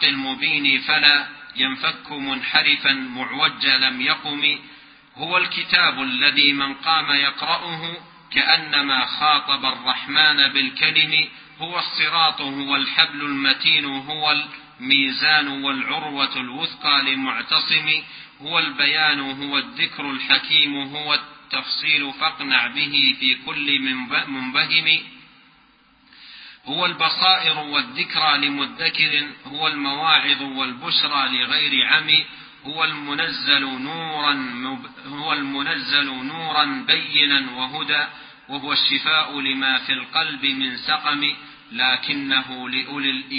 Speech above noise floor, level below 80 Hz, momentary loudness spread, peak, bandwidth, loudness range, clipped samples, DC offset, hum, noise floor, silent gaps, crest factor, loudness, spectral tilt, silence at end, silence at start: 34 dB; -64 dBFS; 11 LU; 0 dBFS; 5.2 kHz; 3 LU; under 0.1%; under 0.1%; none; -55 dBFS; none; 22 dB; -18 LUFS; -7.5 dB/octave; 0 s; 0 s